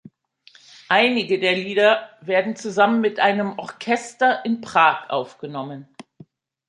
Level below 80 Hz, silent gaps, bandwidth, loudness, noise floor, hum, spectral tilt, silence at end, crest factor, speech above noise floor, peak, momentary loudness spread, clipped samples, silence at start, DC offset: -72 dBFS; none; 11 kHz; -20 LUFS; -54 dBFS; none; -4.5 dB/octave; 0.85 s; 20 dB; 34 dB; -2 dBFS; 14 LU; under 0.1%; 0.9 s; under 0.1%